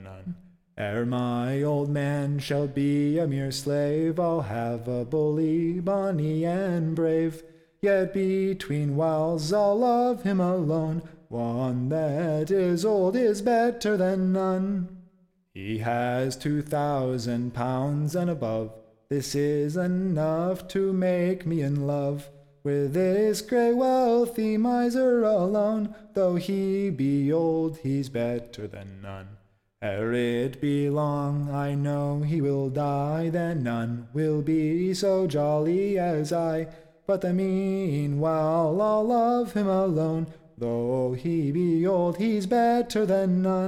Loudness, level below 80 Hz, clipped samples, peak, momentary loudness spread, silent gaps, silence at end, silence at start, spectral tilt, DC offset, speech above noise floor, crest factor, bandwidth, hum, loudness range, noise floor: -26 LUFS; -56 dBFS; under 0.1%; -12 dBFS; 8 LU; none; 0 s; 0 s; -7.5 dB/octave; under 0.1%; 37 dB; 12 dB; 16 kHz; none; 4 LU; -62 dBFS